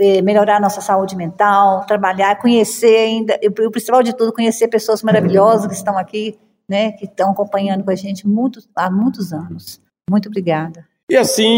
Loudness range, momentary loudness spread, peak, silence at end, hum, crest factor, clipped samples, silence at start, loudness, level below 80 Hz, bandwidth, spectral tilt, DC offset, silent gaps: 5 LU; 11 LU; 0 dBFS; 0 s; none; 14 dB; under 0.1%; 0 s; -15 LUFS; -62 dBFS; 16.5 kHz; -5 dB/octave; under 0.1%; 11.03-11.07 s